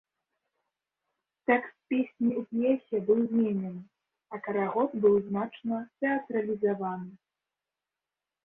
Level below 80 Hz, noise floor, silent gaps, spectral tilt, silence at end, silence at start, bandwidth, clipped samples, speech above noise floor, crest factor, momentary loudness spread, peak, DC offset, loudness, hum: -74 dBFS; -90 dBFS; none; -10.5 dB/octave; 1.3 s; 1.5 s; 3.8 kHz; under 0.1%; 61 dB; 20 dB; 12 LU; -10 dBFS; under 0.1%; -29 LUFS; none